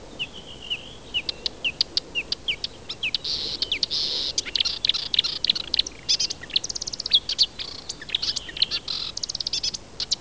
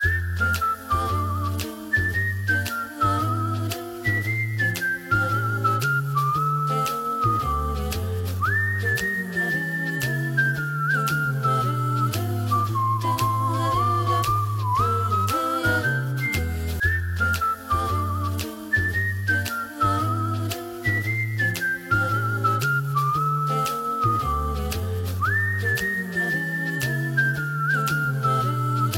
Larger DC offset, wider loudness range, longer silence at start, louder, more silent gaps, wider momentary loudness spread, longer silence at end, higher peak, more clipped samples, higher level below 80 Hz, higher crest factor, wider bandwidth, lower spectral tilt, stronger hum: first, 0.4% vs under 0.1%; about the same, 4 LU vs 2 LU; about the same, 0 s vs 0 s; about the same, -24 LUFS vs -23 LUFS; neither; first, 10 LU vs 4 LU; about the same, 0 s vs 0 s; first, -6 dBFS vs -10 dBFS; neither; second, -50 dBFS vs -40 dBFS; first, 22 dB vs 14 dB; second, 8 kHz vs 17 kHz; second, 0 dB/octave vs -5.5 dB/octave; neither